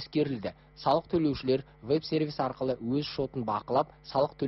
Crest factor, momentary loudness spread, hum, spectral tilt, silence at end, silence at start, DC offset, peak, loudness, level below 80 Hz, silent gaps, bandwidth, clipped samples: 18 dB; 5 LU; none; -5.5 dB/octave; 0 s; 0 s; under 0.1%; -12 dBFS; -31 LUFS; -58 dBFS; none; 6 kHz; under 0.1%